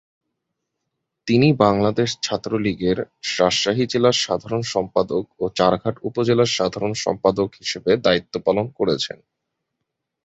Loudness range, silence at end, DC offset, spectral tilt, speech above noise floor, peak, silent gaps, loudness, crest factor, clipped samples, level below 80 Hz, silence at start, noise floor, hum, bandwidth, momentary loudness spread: 2 LU; 1.15 s; under 0.1%; -5 dB/octave; 59 dB; -2 dBFS; none; -20 LUFS; 20 dB; under 0.1%; -52 dBFS; 1.25 s; -79 dBFS; none; 8.2 kHz; 8 LU